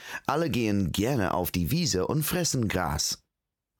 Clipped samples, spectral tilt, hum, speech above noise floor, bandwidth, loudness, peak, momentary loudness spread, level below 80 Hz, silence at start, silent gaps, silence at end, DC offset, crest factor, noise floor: under 0.1%; -4.5 dB/octave; none; 59 dB; 20 kHz; -27 LUFS; -14 dBFS; 2 LU; -48 dBFS; 0 s; none; 0.65 s; under 0.1%; 14 dB; -86 dBFS